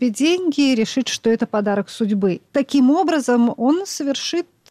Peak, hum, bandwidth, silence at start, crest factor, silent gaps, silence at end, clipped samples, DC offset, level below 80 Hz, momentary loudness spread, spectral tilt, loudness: -8 dBFS; none; 14.5 kHz; 0 s; 10 dB; none; 0.25 s; under 0.1%; under 0.1%; -64 dBFS; 6 LU; -4.5 dB/octave; -19 LUFS